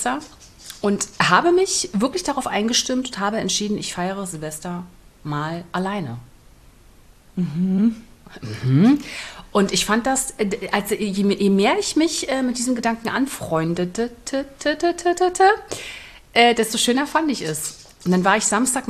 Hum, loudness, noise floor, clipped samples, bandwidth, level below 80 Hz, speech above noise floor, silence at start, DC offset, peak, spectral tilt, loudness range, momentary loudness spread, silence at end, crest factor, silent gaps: none; -20 LUFS; -49 dBFS; under 0.1%; 13.5 kHz; -50 dBFS; 28 dB; 0 s; under 0.1%; -2 dBFS; -4 dB/octave; 7 LU; 14 LU; 0 s; 20 dB; none